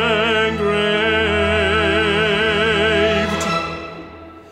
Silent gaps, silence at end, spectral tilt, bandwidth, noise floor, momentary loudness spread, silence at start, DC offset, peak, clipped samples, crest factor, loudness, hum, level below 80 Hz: none; 0 s; -4.5 dB/octave; 13 kHz; -37 dBFS; 11 LU; 0 s; under 0.1%; -4 dBFS; under 0.1%; 14 dB; -16 LUFS; none; -40 dBFS